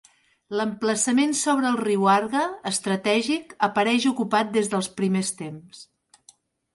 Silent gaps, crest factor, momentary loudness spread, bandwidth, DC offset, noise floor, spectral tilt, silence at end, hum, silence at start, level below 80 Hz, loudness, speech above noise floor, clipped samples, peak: none; 16 dB; 7 LU; 11.5 kHz; under 0.1%; -57 dBFS; -4 dB/octave; 0.9 s; none; 0.5 s; -70 dBFS; -23 LUFS; 34 dB; under 0.1%; -8 dBFS